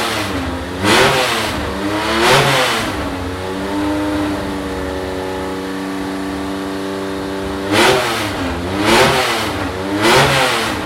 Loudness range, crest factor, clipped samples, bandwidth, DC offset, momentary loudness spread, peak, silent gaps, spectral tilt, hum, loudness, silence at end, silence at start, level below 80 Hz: 7 LU; 14 dB; under 0.1%; 16.5 kHz; under 0.1%; 11 LU; -2 dBFS; none; -3.5 dB/octave; none; -16 LUFS; 0 s; 0 s; -36 dBFS